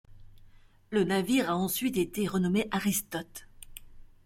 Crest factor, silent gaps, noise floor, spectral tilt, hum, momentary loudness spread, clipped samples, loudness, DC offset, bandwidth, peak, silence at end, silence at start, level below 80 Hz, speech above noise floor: 16 dB; none; -55 dBFS; -5 dB/octave; none; 21 LU; under 0.1%; -29 LUFS; under 0.1%; 16.5 kHz; -14 dBFS; 0.2 s; 0.1 s; -56 dBFS; 27 dB